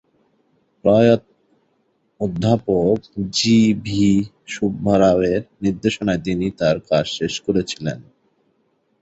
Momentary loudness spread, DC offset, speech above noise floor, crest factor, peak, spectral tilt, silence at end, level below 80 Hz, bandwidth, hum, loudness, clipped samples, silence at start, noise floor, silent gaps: 10 LU; under 0.1%; 47 dB; 18 dB; -2 dBFS; -6 dB/octave; 1 s; -46 dBFS; 8 kHz; none; -19 LUFS; under 0.1%; 0.85 s; -65 dBFS; none